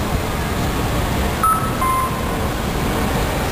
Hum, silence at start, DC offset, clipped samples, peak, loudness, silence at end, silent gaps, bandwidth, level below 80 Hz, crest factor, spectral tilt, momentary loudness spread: none; 0 s; 0.4%; under 0.1%; -6 dBFS; -20 LUFS; 0 s; none; 15.5 kHz; -26 dBFS; 14 dB; -5 dB/octave; 5 LU